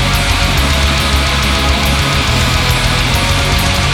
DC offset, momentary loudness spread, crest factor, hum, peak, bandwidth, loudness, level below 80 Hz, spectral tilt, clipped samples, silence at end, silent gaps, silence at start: under 0.1%; 0 LU; 12 dB; none; 0 dBFS; 18.5 kHz; -12 LUFS; -18 dBFS; -3.5 dB/octave; under 0.1%; 0 s; none; 0 s